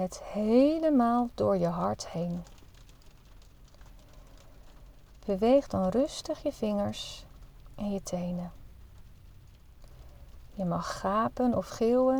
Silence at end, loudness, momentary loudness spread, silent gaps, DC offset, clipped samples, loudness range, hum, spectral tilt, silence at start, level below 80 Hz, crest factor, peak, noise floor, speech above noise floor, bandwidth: 0 s; -29 LUFS; 14 LU; none; under 0.1%; under 0.1%; 12 LU; none; -6.5 dB/octave; 0 s; -52 dBFS; 18 dB; -12 dBFS; -53 dBFS; 25 dB; 20 kHz